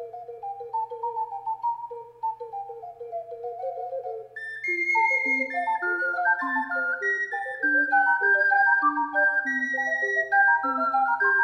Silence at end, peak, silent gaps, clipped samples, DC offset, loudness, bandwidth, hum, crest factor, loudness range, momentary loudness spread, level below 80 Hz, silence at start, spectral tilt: 0 s; -10 dBFS; none; under 0.1%; under 0.1%; -24 LUFS; 9.6 kHz; none; 16 dB; 12 LU; 17 LU; -76 dBFS; 0 s; -3.5 dB/octave